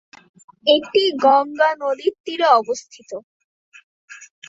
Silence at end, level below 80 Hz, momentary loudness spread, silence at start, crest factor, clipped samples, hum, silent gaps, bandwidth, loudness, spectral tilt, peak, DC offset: 0.25 s; -70 dBFS; 19 LU; 0.65 s; 18 dB; under 0.1%; none; 2.20-2.24 s, 3.24-3.72 s, 3.83-4.08 s; 7.8 kHz; -18 LUFS; -2 dB/octave; -2 dBFS; under 0.1%